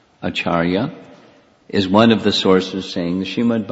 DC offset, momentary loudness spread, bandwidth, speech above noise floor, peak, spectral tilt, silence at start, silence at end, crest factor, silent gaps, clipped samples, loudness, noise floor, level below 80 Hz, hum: under 0.1%; 10 LU; 8 kHz; 33 dB; 0 dBFS; -6 dB/octave; 0.2 s; 0 s; 18 dB; none; under 0.1%; -17 LUFS; -49 dBFS; -52 dBFS; none